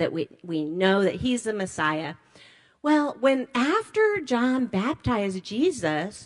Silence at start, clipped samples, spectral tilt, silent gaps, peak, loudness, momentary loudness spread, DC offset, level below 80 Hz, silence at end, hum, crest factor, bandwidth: 0 s; under 0.1%; -5.5 dB/octave; none; -10 dBFS; -25 LUFS; 8 LU; under 0.1%; -54 dBFS; 0 s; none; 16 dB; 11.5 kHz